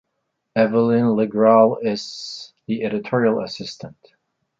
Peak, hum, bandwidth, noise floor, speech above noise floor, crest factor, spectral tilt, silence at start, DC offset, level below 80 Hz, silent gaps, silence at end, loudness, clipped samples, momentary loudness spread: -2 dBFS; none; 7.6 kHz; -75 dBFS; 56 dB; 18 dB; -6.5 dB/octave; 0.55 s; under 0.1%; -64 dBFS; none; 0.7 s; -19 LUFS; under 0.1%; 18 LU